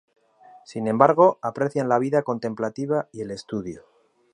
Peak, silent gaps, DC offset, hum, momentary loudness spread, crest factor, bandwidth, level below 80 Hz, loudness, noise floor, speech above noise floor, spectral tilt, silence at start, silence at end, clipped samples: -2 dBFS; none; under 0.1%; none; 16 LU; 22 dB; 10.5 kHz; -64 dBFS; -23 LUFS; -52 dBFS; 29 dB; -7.5 dB/octave; 0.7 s; 0.55 s; under 0.1%